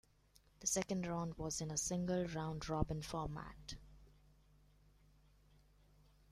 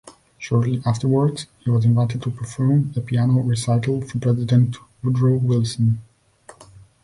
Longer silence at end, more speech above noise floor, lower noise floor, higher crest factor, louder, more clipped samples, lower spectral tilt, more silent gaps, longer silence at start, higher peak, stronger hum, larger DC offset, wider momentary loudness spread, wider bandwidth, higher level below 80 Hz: first, 2.25 s vs 0.4 s; about the same, 30 dB vs 30 dB; first, -71 dBFS vs -49 dBFS; first, 24 dB vs 14 dB; second, -41 LUFS vs -20 LUFS; neither; second, -4.5 dB/octave vs -7.5 dB/octave; neither; first, 0.6 s vs 0.05 s; second, -20 dBFS vs -6 dBFS; first, 50 Hz at -60 dBFS vs none; neither; first, 12 LU vs 7 LU; first, 15 kHz vs 11.5 kHz; second, -58 dBFS vs -52 dBFS